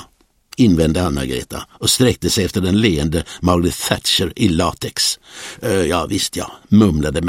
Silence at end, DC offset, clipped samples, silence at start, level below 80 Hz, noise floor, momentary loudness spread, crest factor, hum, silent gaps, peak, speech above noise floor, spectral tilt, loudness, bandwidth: 0 s; under 0.1%; under 0.1%; 0 s; -34 dBFS; -52 dBFS; 10 LU; 18 dB; none; none; 0 dBFS; 36 dB; -4.5 dB/octave; -17 LUFS; 16.5 kHz